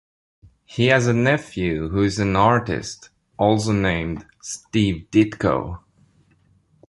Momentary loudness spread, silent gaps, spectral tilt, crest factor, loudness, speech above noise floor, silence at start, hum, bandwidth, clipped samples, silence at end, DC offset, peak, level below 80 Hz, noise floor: 16 LU; none; -6 dB/octave; 20 dB; -20 LUFS; 40 dB; 0.7 s; none; 11.5 kHz; under 0.1%; 1.15 s; under 0.1%; -2 dBFS; -42 dBFS; -59 dBFS